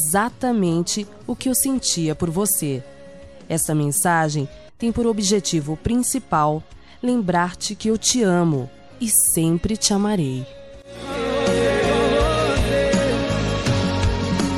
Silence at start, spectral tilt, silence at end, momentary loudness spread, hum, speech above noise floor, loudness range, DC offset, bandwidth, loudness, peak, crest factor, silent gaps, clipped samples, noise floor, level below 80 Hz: 0 s; -4 dB/octave; 0 s; 9 LU; none; 21 dB; 2 LU; 0.4%; 15.5 kHz; -20 LUFS; -2 dBFS; 18 dB; none; under 0.1%; -42 dBFS; -36 dBFS